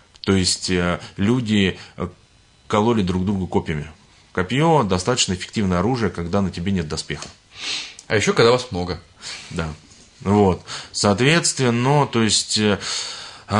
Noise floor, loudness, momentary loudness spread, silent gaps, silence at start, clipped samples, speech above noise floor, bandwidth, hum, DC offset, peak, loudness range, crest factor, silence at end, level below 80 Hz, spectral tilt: -44 dBFS; -20 LUFS; 14 LU; none; 0.25 s; under 0.1%; 24 dB; 11 kHz; none; under 0.1%; -2 dBFS; 4 LU; 18 dB; 0 s; -50 dBFS; -4.5 dB/octave